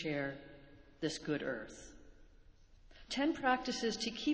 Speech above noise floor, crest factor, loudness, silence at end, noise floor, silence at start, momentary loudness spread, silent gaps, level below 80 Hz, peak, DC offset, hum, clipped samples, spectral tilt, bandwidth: 24 dB; 20 dB; -38 LUFS; 0 s; -61 dBFS; 0 s; 21 LU; none; -64 dBFS; -18 dBFS; under 0.1%; none; under 0.1%; -4 dB/octave; 8 kHz